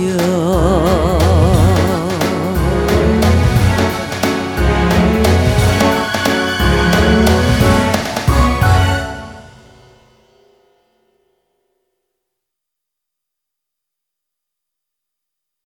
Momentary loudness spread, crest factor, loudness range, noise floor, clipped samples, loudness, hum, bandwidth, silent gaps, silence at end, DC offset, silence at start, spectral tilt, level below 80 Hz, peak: 5 LU; 14 dB; 6 LU; -80 dBFS; under 0.1%; -13 LUFS; none; 18.5 kHz; none; 6.2 s; under 0.1%; 0 s; -6 dB/octave; -22 dBFS; 0 dBFS